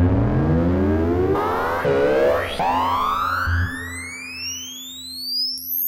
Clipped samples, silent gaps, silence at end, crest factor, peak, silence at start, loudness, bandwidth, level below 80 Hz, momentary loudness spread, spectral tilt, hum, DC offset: under 0.1%; none; 0 s; 12 dB; -10 dBFS; 0 s; -21 LUFS; 16 kHz; -34 dBFS; 11 LU; -5.5 dB/octave; none; under 0.1%